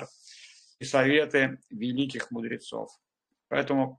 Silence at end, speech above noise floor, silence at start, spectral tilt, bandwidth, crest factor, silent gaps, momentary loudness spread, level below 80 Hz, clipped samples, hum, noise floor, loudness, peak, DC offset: 0.05 s; 25 dB; 0 s; -5 dB/octave; 9.8 kHz; 20 dB; none; 22 LU; -70 dBFS; under 0.1%; none; -53 dBFS; -28 LUFS; -8 dBFS; under 0.1%